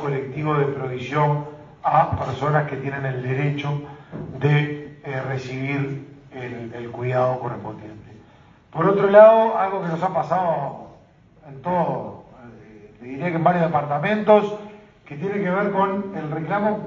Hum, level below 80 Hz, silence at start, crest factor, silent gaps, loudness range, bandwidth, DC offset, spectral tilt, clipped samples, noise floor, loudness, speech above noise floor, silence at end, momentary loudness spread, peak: none; -56 dBFS; 0 s; 22 dB; none; 9 LU; 7.2 kHz; under 0.1%; -8.5 dB/octave; under 0.1%; -51 dBFS; -21 LUFS; 31 dB; 0 s; 18 LU; 0 dBFS